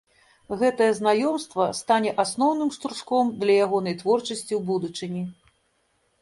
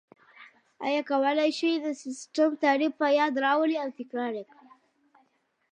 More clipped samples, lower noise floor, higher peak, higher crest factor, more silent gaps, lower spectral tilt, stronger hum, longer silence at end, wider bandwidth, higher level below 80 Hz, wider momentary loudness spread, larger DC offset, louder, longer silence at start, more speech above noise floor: neither; about the same, -69 dBFS vs -70 dBFS; first, -6 dBFS vs -12 dBFS; about the same, 18 dB vs 16 dB; neither; first, -5 dB/octave vs -3 dB/octave; neither; second, 0.9 s vs 1.3 s; first, 11.5 kHz vs 9.8 kHz; first, -66 dBFS vs -88 dBFS; about the same, 10 LU vs 10 LU; neither; first, -24 LUFS vs -27 LUFS; about the same, 0.5 s vs 0.4 s; about the same, 45 dB vs 44 dB